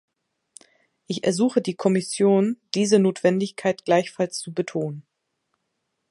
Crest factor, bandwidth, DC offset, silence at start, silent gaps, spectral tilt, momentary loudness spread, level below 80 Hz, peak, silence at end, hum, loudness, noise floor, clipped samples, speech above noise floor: 20 dB; 11.5 kHz; under 0.1%; 1.1 s; none; -5.5 dB/octave; 9 LU; -72 dBFS; -4 dBFS; 1.1 s; none; -23 LUFS; -77 dBFS; under 0.1%; 55 dB